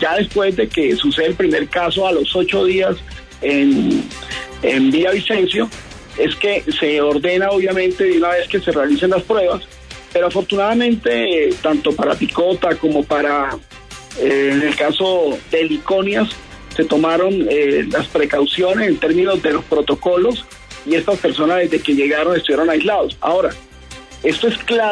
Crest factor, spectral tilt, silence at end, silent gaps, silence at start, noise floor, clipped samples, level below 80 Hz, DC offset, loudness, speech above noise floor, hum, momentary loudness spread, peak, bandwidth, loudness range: 12 dB; -5 dB/octave; 0 s; none; 0 s; -37 dBFS; under 0.1%; -42 dBFS; under 0.1%; -16 LUFS; 21 dB; none; 9 LU; -4 dBFS; 11 kHz; 1 LU